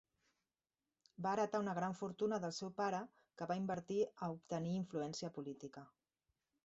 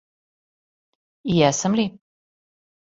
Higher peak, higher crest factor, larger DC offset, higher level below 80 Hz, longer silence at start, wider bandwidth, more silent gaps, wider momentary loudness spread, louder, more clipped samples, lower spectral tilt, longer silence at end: second, -26 dBFS vs -4 dBFS; about the same, 18 dB vs 22 dB; neither; second, -82 dBFS vs -58 dBFS; about the same, 1.2 s vs 1.25 s; about the same, 8 kHz vs 8.2 kHz; neither; about the same, 11 LU vs 10 LU; second, -42 LUFS vs -21 LUFS; neither; about the same, -5.5 dB/octave vs -5 dB/octave; second, 0.8 s vs 0.95 s